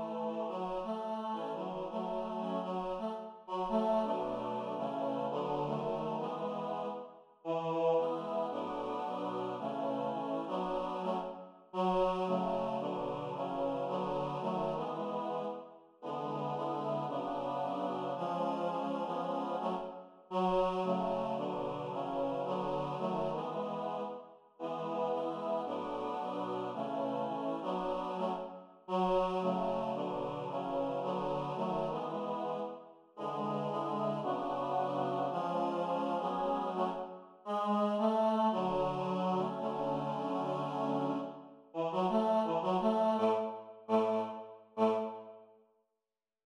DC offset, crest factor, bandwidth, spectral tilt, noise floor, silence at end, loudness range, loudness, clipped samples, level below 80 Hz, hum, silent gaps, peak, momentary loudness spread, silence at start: under 0.1%; 18 dB; 10.5 kHz; -7.5 dB/octave; under -90 dBFS; 1.05 s; 4 LU; -36 LUFS; under 0.1%; -64 dBFS; none; none; -18 dBFS; 9 LU; 0 s